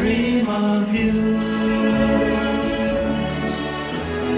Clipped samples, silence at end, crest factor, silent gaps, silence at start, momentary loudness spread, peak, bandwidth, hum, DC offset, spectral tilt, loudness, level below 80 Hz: under 0.1%; 0 s; 12 dB; none; 0 s; 6 LU; -8 dBFS; 4 kHz; none; under 0.1%; -10.5 dB/octave; -20 LUFS; -36 dBFS